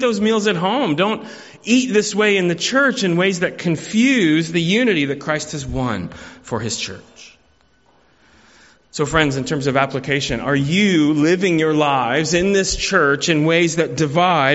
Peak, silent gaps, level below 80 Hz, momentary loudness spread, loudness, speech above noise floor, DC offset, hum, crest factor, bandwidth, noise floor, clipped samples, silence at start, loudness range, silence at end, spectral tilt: 0 dBFS; none; -44 dBFS; 9 LU; -17 LUFS; 40 dB; under 0.1%; none; 18 dB; 8.2 kHz; -57 dBFS; under 0.1%; 0 s; 9 LU; 0 s; -4.5 dB/octave